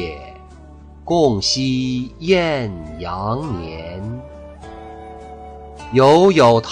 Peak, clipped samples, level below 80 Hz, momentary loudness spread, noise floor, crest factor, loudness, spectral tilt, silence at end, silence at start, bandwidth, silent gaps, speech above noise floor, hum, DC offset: -2 dBFS; under 0.1%; -40 dBFS; 25 LU; -40 dBFS; 16 dB; -17 LUFS; -5.5 dB/octave; 0 s; 0 s; 11 kHz; none; 24 dB; none; under 0.1%